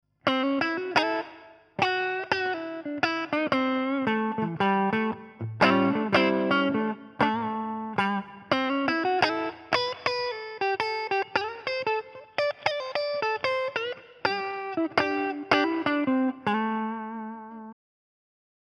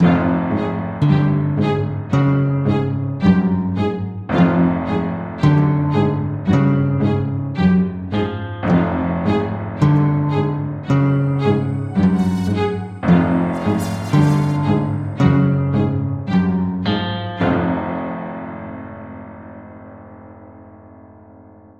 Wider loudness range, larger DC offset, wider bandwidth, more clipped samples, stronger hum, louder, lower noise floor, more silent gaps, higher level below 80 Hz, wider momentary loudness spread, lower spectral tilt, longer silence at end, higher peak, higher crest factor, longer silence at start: about the same, 4 LU vs 6 LU; neither; first, 10.5 kHz vs 9.4 kHz; neither; neither; second, -27 LUFS vs -18 LUFS; first, -50 dBFS vs -43 dBFS; neither; second, -66 dBFS vs -44 dBFS; about the same, 9 LU vs 10 LU; second, -5.5 dB/octave vs -8.5 dB/octave; first, 0.95 s vs 0.8 s; second, -6 dBFS vs -2 dBFS; first, 22 dB vs 16 dB; first, 0.25 s vs 0 s